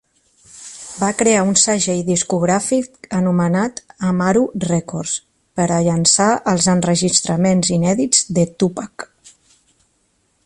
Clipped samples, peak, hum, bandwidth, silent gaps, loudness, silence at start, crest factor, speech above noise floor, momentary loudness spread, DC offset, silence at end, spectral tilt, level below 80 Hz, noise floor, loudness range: under 0.1%; 0 dBFS; none; 11.5 kHz; none; -16 LUFS; 0.55 s; 18 dB; 47 dB; 13 LU; under 0.1%; 1.4 s; -4 dB/octave; -52 dBFS; -63 dBFS; 4 LU